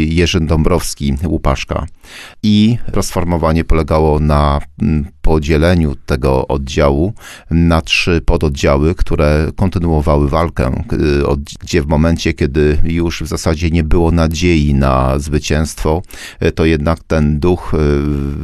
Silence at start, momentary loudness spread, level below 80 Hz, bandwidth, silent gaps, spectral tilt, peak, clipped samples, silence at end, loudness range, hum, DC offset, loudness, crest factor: 0 s; 6 LU; -20 dBFS; 13 kHz; none; -6.5 dB/octave; 0 dBFS; under 0.1%; 0 s; 1 LU; none; 0.4%; -14 LUFS; 12 dB